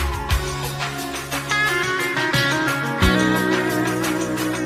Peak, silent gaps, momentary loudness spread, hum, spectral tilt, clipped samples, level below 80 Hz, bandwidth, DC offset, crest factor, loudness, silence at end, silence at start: -4 dBFS; none; 7 LU; none; -4 dB/octave; under 0.1%; -32 dBFS; 16 kHz; under 0.1%; 16 dB; -20 LUFS; 0 s; 0 s